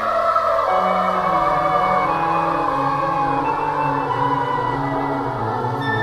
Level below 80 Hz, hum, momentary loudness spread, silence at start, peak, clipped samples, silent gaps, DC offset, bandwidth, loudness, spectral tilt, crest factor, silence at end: -44 dBFS; none; 5 LU; 0 s; -6 dBFS; under 0.1%; none; under 0.1%; 15 kHz; -19 LUFS; -6.5 dB/octave; 12 dB; 0 s